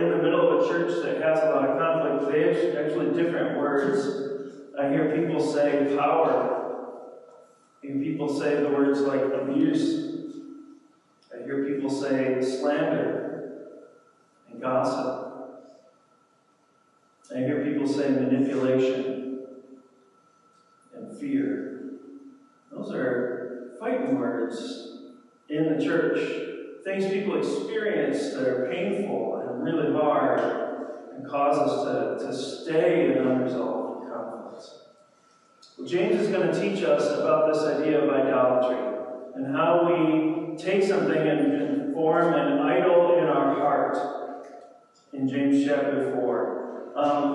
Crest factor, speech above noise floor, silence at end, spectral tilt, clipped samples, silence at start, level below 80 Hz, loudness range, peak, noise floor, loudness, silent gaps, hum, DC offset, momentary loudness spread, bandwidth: 16 dB; 40 dB; 0 s; -6.5 dB/octave; under 0.1%; 0 s; -86 dBFS; 8 LU; -10 dBFS; -64 dBFS; -25 LUFS; none; none; under 0.1%; 15 LU; 11 kHz